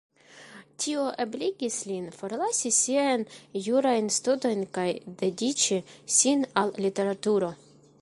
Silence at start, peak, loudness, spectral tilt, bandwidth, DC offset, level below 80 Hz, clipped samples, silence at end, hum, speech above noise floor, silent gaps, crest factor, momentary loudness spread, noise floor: 0.35 s; -6 dBFS; -27 LUFS; -3 dB/octave; 11.5 kHz; under 0.1%; -72 dBFS; under 0.1%; 0.45 s; none; 23 dB; none; 20 dB; 10 LU; -50 dBFS